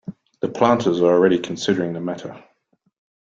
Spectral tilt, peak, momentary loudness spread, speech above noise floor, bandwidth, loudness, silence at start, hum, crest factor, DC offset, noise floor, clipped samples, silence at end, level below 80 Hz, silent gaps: -6 dB/octave; -2 dBFS; 16 LU; 47 dB; 7.6 kHz; -19 LUFS; 0.05 s; none; 18 dB; under 0.1%; -66 dBFS; under 0.1%; 0.9 s; -62 dBFS; none